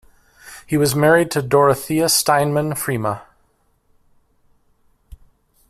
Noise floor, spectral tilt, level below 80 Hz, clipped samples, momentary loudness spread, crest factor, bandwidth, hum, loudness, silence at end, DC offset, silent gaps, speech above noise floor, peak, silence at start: -62 dBFS; -4 dB/octave; -52 dBFS; under 0.1%; 11 LU; 18 dB; 16 kHz; none; -17 LUFS; 0.55 s; under 0.1%; none; 45 dB; -2 dBFS; 0.45 s